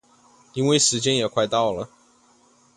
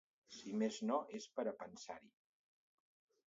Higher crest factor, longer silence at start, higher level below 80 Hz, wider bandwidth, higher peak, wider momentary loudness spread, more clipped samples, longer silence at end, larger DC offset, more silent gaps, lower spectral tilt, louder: about the same, 20 dB vs 20 dB; first, 0.55 s vs 0.3 s; first, -60 dBFS vs -88 dBFS; first, 11.5 kHz vs 7.6 kHz; first, -4 dBFS vs -26 dBFS; about the same, 16 LU vs 15 LU; neither; second, 0.9 s vs 1.2 s; neither; neither; about the same, -3.5 dB/octave vs -4.5 dB/octave; first, -21 LUFS vs -44 LUFS